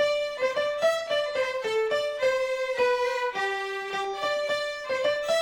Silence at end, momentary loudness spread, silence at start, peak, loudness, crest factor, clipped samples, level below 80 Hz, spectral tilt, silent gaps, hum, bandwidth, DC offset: 0 s; 4 LU; 0 s; -14 dBFS; -27 LUFS; 14 dB; under 0.1%; -64 dBFS; -1.5 dB/octave; none; none; 17 kHz; under 0.1%